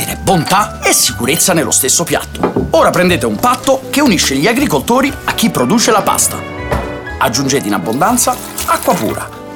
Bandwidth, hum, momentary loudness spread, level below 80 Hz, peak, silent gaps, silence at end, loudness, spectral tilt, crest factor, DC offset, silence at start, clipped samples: over 20 kHz; none; 7 LU; -34 dBFS; 0 dBFS; none; 0 s; -12 LUFS; -3 dB/octave; 12 dB; under 0.1%; 0 s; under 0.1%